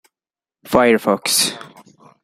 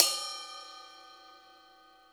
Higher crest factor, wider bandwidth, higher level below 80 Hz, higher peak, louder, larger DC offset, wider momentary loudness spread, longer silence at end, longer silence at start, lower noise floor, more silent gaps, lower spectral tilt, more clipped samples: second, 20 dB vs 36 dB; second, 16 kHz vs over 20 kHz; first, -52 dBFS vs -84 dBFS; about the same, 0 dBFS vs 0 dBFS; first, -16 LUFS vs -33 LUFS; neither; second, 6 LU vs 23 LU; second, 0.6 s vs 0.75 s; first, 0.65 s vs 0 s; first, under -90 dBFS vs -59 dBFS; neither; first, -2.5 dB/octave vs 2.5 dB/octave; neither